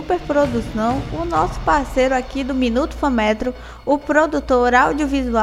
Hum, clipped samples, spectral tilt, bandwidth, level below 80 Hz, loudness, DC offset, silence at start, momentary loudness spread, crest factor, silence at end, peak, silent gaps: none; under 0.1%; -5.5 dB/octave; 14 kHz; -32 dBFS; -18 LUFS; under 0.1%; 0 s; 6 LU; 18 dB; 0 s; 0 dBFS; none